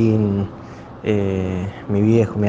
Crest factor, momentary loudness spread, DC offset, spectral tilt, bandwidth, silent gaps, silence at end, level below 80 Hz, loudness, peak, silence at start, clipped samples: 16 dB; 13 LU; under 0.1%; -9 dB/octave; 7.6 kHz; none; 0 s; -48 dBFS; -20 LUFS; -2 dBFS; 0 s; under 0.1%